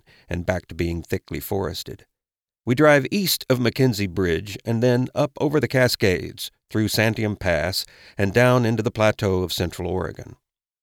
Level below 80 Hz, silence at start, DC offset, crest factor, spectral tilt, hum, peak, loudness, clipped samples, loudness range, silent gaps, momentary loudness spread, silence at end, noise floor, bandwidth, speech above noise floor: -46 dBFS; 0.3 s; under 0.1%; 18 dB; -5.5 dB/octave; none; -4 dBFS; -22 LUFS; under 0.1%; 2 LU; none; 11 LU; 0.5 s; under -90 dBFS; 17.5 kHz; over 68 dB